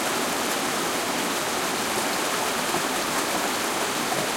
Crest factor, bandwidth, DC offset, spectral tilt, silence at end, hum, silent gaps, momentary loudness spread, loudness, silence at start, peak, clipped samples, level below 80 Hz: 14 dB; 16.5 kHz; under 0.1%; -1.5 dB/octave; 0 s; none; none; 1 LU; -24 LUFS; 0 s; -12 dBFS; under 0.1%; -58 dBFS